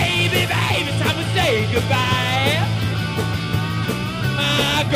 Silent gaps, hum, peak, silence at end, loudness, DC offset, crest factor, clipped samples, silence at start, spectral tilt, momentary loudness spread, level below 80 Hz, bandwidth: none; none; -4 dBFS; 0 s; -19 LUFS; under 0.1%; 16 dB; under 0.1%; 0 s; -4.5 dB/octave; 5 LU; -40 dBFS; 16 kHz